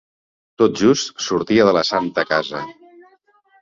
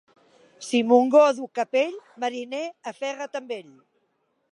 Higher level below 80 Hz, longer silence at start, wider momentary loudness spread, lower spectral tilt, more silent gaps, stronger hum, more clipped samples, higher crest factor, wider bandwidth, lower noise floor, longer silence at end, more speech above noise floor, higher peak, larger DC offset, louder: first, -56 dBFS vs -84 dBFS; about the same, 0.6 s vs 0.6 s; second, 11 LU vs 17 LU; about the same, -4.5 dB/octave vs -3.5 dB/octave; neither; neither; neither; about the same, 18 dB vs 20 dB; second, 7.6 kHz vs 11 kHz; second, -56 dBFS vs -72 dBFS; about the same, 0.9 s vs 0.9 s; second, 39 dB vs 49 dB; about the same, -2 dBFS vs -4 dBFS; neither; first, -18 LUFS vs -23 LUFS